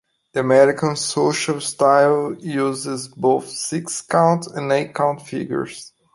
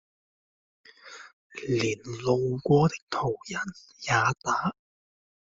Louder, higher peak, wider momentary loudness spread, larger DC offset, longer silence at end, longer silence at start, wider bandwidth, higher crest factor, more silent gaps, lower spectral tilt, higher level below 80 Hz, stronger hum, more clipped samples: first, -19 LUFS vs -27 LUFS; first, -2 dBFS vs -10 dBFS; second, 12 LU vs 21 LU; neither; second, 0.25 s vs 0.8 s; second, 0.35 s vs 1.05 s; first, 11.5 kHz vs 7.8 kHz; about the same, 18 dB vs 20 dB; second, none vs 1.33-1.50 s, 3.02-3.07 s; about the same, -4.5 dB/octave vs -5.5 dB/octave; about the same, -64 dBFS vs -60 dBFS; neither; neither